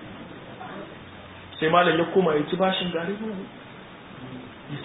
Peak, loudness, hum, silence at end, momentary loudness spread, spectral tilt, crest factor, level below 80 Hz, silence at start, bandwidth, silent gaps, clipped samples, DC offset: -6 dBFS; -23 LUFS; none; 0 s; 22 LU; -10 dB/octave; 20 dB; -58 dBFS; 0 s; 4 kHz; none; under 0.1%; under 0.1%